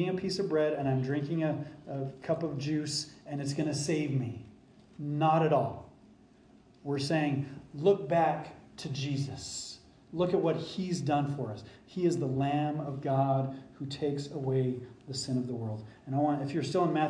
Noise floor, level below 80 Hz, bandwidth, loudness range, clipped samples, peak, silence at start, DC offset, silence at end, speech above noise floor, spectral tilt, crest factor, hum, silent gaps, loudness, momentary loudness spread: -59 dBFS; -66 dBFS; 10.5 kHz; 2 LU; under 0.1%; -14 dBFS; 0 s; under 0.1%; 0 s; 28 dB; -6 dB/octave; 18 dB; none; none; -32 LUFS; 12 LU